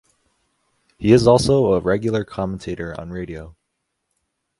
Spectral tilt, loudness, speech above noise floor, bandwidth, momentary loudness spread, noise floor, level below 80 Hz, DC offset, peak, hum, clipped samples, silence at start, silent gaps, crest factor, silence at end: -6.5 dB/octave; -18 LUFS; 57 dB; 11.5 kHz; 17 LU; -76 dBFS; -44 dBFS; under 0.1%; 0 dBFS; none; under 0.1%; 1 s; none; 20 dB; 1.1 s